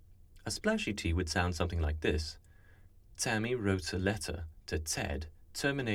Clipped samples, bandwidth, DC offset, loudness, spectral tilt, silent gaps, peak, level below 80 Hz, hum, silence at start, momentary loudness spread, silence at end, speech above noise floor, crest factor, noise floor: under 0.1%; 16 kHz; under 0.1%; -35 LUFS; -4.5 dB/octave; none; -16 dBFS; -44 dBFS; none; 0 s; 11 LU; 0 s; 24 dB; 20 dB; -58 dBFS